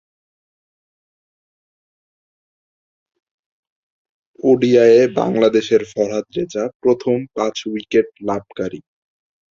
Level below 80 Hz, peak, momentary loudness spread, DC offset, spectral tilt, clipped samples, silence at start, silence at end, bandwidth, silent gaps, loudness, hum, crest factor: -60 dBFS; 0 dBFS; 13 LU; under 0.1%; -6 dB/octave; under 0.1%; 4.45 s; 0.7 s; 7.4 kHz; 6.75-6.80 s; -17 LUFS; none; 18 dB